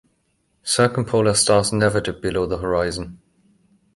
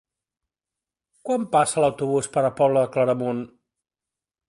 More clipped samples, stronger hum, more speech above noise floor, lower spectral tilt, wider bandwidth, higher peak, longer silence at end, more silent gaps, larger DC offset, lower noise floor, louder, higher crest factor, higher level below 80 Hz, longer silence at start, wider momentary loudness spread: neither; neither; second, 48 dB vs 68 dB; second, -4 dB/octave vs -5.5 dB/octave; about the same, 11.5 kHz vs 11.5 kHz; about the same, -4 dBFS vs -6 dBFS; second, 0.8 s vs 1.05 s; neither; neither; second, -67 dBFS vs -89 dBFS; first, -19 LUFS vs -22 LUFS; about the same, 18 dB vs 18 dB; first, -44 dBFS vs -64 dBFS; second, 0.65 s vs 1.25 s; about the same, 11 LU vs 10 LU